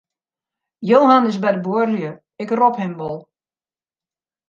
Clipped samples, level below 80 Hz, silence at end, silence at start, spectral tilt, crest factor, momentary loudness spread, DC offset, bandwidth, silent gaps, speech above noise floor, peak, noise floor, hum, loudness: under 0.1%; -68 dBFS; 1.3 s; 0.8 s; -7.5 dB/octave; 18 dB; 17 LU; under 0.1%; 7.4 kHz; none; over 73 dB; -2 dBFS; under -90 dBFS; none; -17 LUFS